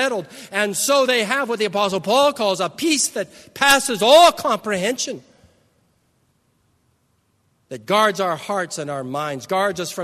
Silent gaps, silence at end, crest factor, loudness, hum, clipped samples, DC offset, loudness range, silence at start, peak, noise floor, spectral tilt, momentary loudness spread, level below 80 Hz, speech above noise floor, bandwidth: none; 0 s; 20 dB; -18 LUFS; none; under 0.1%; under 0.1%; 11 LU; 0 s; 0 dBFS; -65 dBFS; -2.5 dB/octave; 13 LU; -62 dBFS; 46 dB; 13.5 kHz